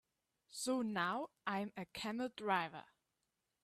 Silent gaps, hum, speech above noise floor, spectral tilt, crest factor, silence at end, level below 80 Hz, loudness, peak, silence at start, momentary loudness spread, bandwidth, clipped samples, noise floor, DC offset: none; none; 47 dB; -4 dB/octave; 22 dB; 0.8 s; -82 dBFS; -41 LUFS; -22 dBFS; 0.5 s; 9 LU; 15 kHz; under 0.1%; -87 dBFS; under 0.1%